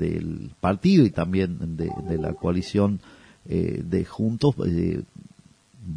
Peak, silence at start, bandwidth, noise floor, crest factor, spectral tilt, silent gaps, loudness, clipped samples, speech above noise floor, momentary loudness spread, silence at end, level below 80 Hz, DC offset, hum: -6 dBFS; 0 s; 10.5 kHz; -54 dBFS; 18 dB; -8 dB/octave; none; -24 LUFS; under 0.1%; 31 dB; 12 LU; 0 s; -46 dBFS; under 0.1%; none